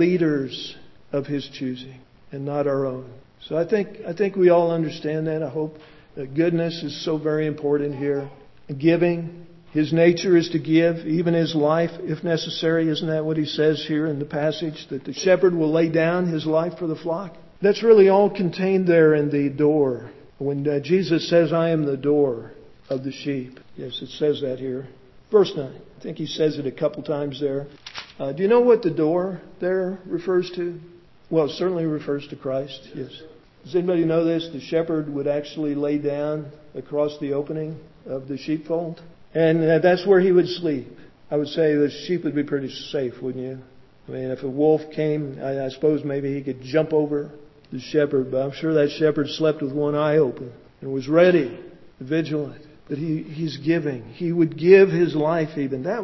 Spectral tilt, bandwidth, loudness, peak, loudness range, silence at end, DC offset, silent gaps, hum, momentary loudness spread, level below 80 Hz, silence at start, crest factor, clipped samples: -7 dB/octave; 6.2 kHz; -22 LUFS; 0 dBFS; 6 LU; 0 s; under 0.1%; none; none; 15 LU; -60 dBFS; 0 s; 22 dB; under 0.1%